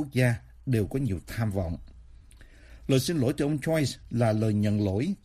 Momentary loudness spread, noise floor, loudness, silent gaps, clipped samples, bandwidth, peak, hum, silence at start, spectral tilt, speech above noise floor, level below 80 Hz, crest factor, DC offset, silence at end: 7 LU; -51 dBFS; -28 LUFS; none; under 0.1%; 15.5 kHz; -10 dBFS; none; 0 s; -6.5 dB/octave; 24 dB; -48 dBFS; 16 dB; under 0.1%; 0.1 s